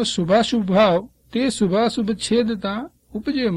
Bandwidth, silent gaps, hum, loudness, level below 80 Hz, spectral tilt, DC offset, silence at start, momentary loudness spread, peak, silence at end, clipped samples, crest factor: 11.5 kHz; none; none; -20 LUFS; -50 dBFS; -5 dB/octave; under 0.1%; 0 s; 12 LU; -4 dBFS; 0 s; under 0.1%; 16 dB